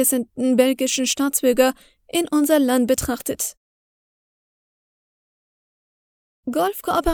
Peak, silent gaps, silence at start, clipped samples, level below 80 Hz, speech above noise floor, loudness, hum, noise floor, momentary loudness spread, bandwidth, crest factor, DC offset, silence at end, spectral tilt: -2 dBFS; 3.57-6.43 s; 0 s; under 0.1%; -44 dBFS; over 71 dB; -20 LUFS; none; under -90 dBFS; 9 LU; over 20 kHz; 20 dB; under 0.1%; 0 s; -3 dB/octave